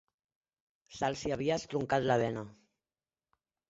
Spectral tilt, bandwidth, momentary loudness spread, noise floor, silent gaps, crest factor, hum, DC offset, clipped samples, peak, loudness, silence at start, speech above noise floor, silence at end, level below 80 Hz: -4.5 dB/octave; 8 kHz; 15 LU; under -90 dBFS; none; 22 dB; none; under 0.1%; under 0.1%; -14 dBFS; -33 LUFS; 0.9 s; over 58 dB; 1.15 s; -64 dBFS